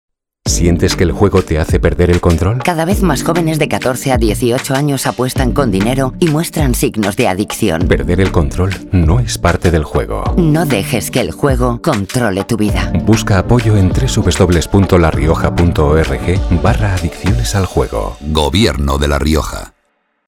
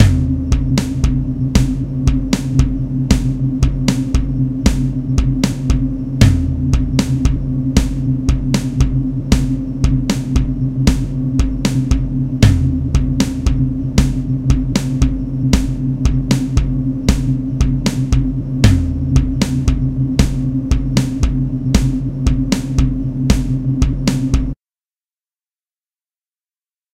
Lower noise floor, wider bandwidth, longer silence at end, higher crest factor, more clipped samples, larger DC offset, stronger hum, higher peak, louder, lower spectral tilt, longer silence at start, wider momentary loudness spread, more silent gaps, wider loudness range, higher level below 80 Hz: second, -62 dBFS vs under -90 dBFS; first, 17 kHz vs 14 kHz; second, 0.6 s vs 2.4 s; about the same, 12 dB vs 16 dB; neither; neither; neither; about the same, 0 dBFS vs 0 dBFS; first, -13 LUFS vs -17 LUFS; about the same, -6 dB/octave vs -6.5 dB/octave; first, 0.45 s vs 0 s; about the same, 5 LU vs 4 LU; neither; about the same, 2 LU vs 1 LU; about the same, -22 dBFS vs -20 dBFS